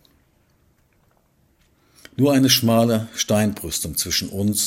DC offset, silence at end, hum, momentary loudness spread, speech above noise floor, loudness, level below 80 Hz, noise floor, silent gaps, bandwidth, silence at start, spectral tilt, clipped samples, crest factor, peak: under 0.1%; 0 s; none; 8 LU; 42 dB; -19 LUFS; -50 dBFS; -61 dBFS; none; 16.5 kHz; 2.2 s; -4 dB/octave; under 0.1%; 18 dB; -4 dBFS